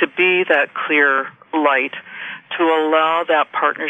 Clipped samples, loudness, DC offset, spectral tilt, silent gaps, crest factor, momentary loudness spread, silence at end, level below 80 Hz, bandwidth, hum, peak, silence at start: under 0.1%; -16 LUFS; under 0.1%; -5.5 dB/octave; none; 16 dB; 12 LU; 0 s; -76 dBFS; 8 kHz; none; -2 dBFS; 0 s